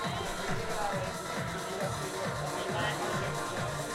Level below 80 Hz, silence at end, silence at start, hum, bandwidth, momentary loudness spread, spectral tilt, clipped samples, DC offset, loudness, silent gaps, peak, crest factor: -50 dBFS; 0 s; 0 s; none; 16 kHz; 3 LU; -4 dB/octave; under 0.1%; under 0.1%; -34 LUFS; none; -20 dBFS; 14 dB